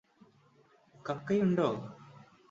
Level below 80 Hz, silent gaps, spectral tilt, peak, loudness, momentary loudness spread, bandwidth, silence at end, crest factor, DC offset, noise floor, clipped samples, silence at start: -72 dBFS; none; -8 dB/octave; -16 dBFS; -32 LUFS; 19 LU; 7.6 kHz; 0.35 s; 20 dB; under 0.1%; -65 dBFS; under 0.1%; 1.05 s